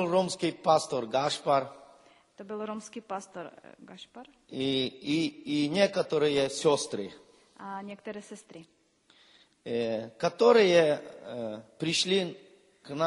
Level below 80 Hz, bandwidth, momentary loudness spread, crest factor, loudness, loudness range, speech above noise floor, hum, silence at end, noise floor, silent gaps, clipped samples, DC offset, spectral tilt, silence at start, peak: -72 dBFS; 11.5 kHz; 19 LU; 22 dB; -28 LUFS; 10 LU; 35 dB; none; 0 s; -64 dBFS; none; under 0.1%; under 0.1%; -4.5 dB/octave; 0 s; -8 dBFS